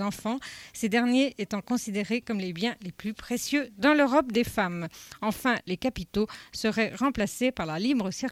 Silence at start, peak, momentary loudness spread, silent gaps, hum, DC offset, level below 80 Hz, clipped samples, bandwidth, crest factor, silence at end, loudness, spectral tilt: 0 s; -10 dBFS; 10 LU; none; none; under 0.1%; -54 dBFS; under 0.1%; 16.5 kHz; 18 dB; 0 s; -28 LUFS; -4.5 dB/octave